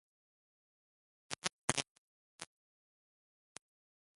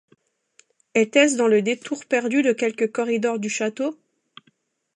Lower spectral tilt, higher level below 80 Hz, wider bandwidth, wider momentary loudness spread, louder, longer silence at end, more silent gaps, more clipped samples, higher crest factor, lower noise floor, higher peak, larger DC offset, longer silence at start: second, -1.5 dB/octave vs -3.5 dB/octave; about the same, -76 dBFS vs -78 dBFS; about the same, 11.5 kHz vs 11 kHz; first, 21 LU vs 9 LU; second, -39 LUFS vs -21 LUFS; first, 1.75 s vs 1 s; first, 1.53-1.68 s, 1.90-2.39 s vs none; neither; first, 40 dB vs 18 dB; first, under -90 dBFS vs -65 dBFS; second, -8 dBFS vs -4 dBFS; neither; first, 1.3 s vs 0.95 s